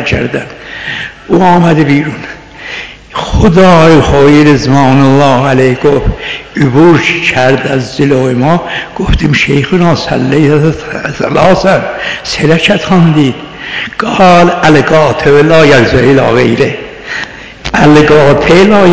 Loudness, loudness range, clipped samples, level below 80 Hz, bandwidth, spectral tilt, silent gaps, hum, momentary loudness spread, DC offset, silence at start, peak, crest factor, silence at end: -7 LUFS; 3 LU; 10%; -24 dBFS; 8 kHz; -6.5 dB/octave; none; none; 14 LU; 2%; 0 s; 0 dBFS; 8 dB; 0 s